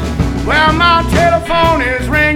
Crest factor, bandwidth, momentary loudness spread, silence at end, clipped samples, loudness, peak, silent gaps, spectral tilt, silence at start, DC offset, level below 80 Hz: 12 dB; 17 kHz; 5 LU; 0 s; under 0.1%; -11 LUFS; 0 dBFS; none; -5.5 dB/octave; 0 s; under 0.1%; -22 dBFS